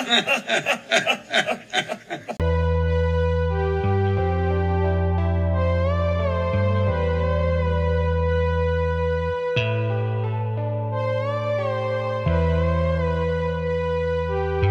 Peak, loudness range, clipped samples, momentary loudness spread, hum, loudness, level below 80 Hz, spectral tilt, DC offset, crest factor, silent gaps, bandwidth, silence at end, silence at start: -4 dBFS; 2 LU; under 0.1%; 4 LU; none; -23 LUFS; -36 dBFS; -6 dB/octave; under 0.1%; 18 dB; none; 9.6 kHz; 0 s; 0 s